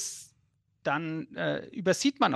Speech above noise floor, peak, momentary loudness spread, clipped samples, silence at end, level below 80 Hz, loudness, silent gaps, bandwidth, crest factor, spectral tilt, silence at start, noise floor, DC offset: 43 dB; -10 dBFS; 10 LU; under 0.1%; 0 s; -72 dBFS; -31 LUFS; none; 12.5 kHz; 20 dB; -4 dB/octave; 0 s; -72 dBFS; under 0.1%